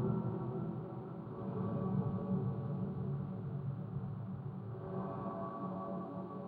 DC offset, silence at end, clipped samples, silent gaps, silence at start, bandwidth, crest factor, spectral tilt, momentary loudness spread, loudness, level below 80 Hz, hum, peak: under 0.1%; 0 s; under 0.1%; none; 0 s; 4.4 kHz; 16 dB; -12 dB/octave; 7 LU; -41 LUFS; -64 dBFS; none; -24 dBFS